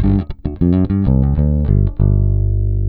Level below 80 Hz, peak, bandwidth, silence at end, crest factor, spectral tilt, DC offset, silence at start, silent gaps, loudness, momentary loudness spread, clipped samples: -18 dBFS; -2 dBFS; 4.2 kHz; 0 s; 10 dB; -13.5 dB/octave; under 0.1%; 0 s; none; -16 LUFS; 4 LU; under 0.1%